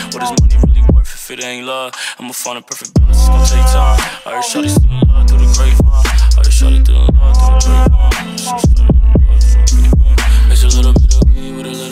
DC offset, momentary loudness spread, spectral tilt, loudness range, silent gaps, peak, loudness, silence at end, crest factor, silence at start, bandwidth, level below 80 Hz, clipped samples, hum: under 0.1%; 11 LU; -5 dB/octave; 4 LU; none; 0 dBFS; -11 LUFS; 0 s; 8 dB; 0 s; 14 kHz; -8 dBFS; under 0.1%; none